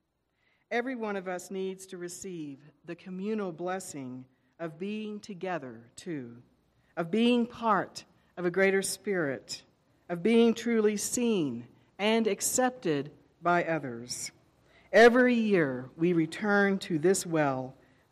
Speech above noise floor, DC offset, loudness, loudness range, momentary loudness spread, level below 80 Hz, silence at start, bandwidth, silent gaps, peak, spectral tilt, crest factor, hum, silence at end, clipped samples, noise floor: 46 dB; under 0.1%; -29 LUFS; 12 LU; 17 LU; -70 dBFS; 0.7 s; 15 kHz; none; -12 dBFS; -4.5 dB/octave; 18 dB; none; 0.4 s; under 0.1%; -75 dBFS